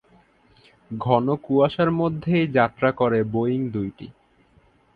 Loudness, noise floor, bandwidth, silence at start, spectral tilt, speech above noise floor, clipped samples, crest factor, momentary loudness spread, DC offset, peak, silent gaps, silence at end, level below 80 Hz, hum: -22 LUFS; -58 dBFS; 4.9 kHz; 0.9 s; -10 dB/octave; 37 dB; under 0.1%; 20 dB; 12 LU; under 0.1%; -4 dBFS; none; 0.85 s; -56 dBFS; none